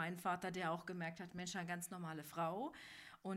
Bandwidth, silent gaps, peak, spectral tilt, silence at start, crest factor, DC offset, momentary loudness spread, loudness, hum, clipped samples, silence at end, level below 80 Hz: 16 kHz; none; -28 dBFS; -4.5 dB/octave; 0 s; 16 dB; under 0.1%; 7 LU; -45 LUFS; none; under 0.1%; 0 s; -80 dBFS